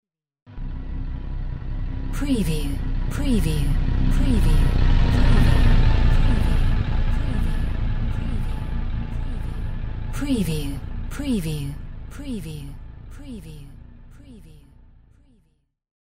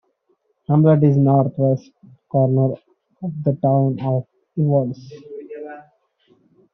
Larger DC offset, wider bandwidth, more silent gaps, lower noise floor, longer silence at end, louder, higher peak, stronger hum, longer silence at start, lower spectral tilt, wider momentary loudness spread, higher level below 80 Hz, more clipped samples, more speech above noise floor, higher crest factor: first, 0.8% vs under 0.1%; first, 13.5 kHz vs 5.8 kHz; first, 0.42-0.46 s vs none; about the same, -66 dBFS vs -66 dBFS; second, 0.15 s vs 0.95 s; second, -25 LUFS vs -18 LUFS; about the same, -4 dBFS vs -4 dBFS; neither; second, 0.05 s vs 0.7 s; second, -6.5 dB/octave vs -11.5 dB/octave; second, 18 LU vs 21 LU; first, -22 dBFS vs -62 dBFS; neither; second, 45 dB vs 49 dB; about the same, 16 dB vs 16 dB